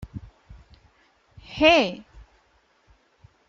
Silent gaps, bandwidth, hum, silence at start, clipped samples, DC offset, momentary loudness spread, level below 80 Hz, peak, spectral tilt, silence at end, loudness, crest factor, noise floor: none; 7.6 kHz; none; 0 s; under 0.1%; under 0.1%; 25 LU; -50 dBFS; -4 dBFS; -4.5 dB/octave; 1.5 s; -19 LUFS; 24 dB; -63 dBFS